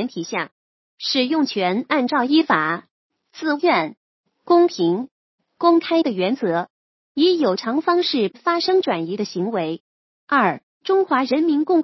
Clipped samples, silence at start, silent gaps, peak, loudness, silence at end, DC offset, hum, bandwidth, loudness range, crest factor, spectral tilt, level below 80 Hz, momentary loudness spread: under 0.1%; 0 s; 0.51-0.98 s, 2.91-3.10 s, 3.97-4.24 s, 5.11-5.38 s, 6.70-7.15 s, 9.80-10.27 s, 10.63-10.81 s; -2 dBFS; -20 LUFS; 0 s; under 0.1%; none; 6.2 kHz; 1 LU; 18 dB; -5.5 dB/octave; -76 dBFS; 11 LU